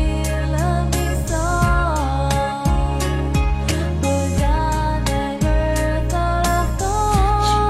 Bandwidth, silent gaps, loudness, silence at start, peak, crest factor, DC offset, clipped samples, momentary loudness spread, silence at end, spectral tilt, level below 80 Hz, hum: 14.5 kHz; none; -20 LUFS; 0 s; -4 dBFS; 14 dB; under 0.1%; under 0.1%; 3 LU; 0 s; -5.5 dB/octave; -22 dBFS; none